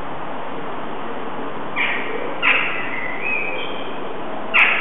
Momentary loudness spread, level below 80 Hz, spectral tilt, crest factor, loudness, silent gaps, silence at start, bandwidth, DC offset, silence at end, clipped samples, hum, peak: 13 LU; -56 dBFS; -6 dB/octave; 22 dB; -22 LUFS; none; 0 s; 9.6 kHz; 6%; 0 s; under 0.1%; none; -2 dBFS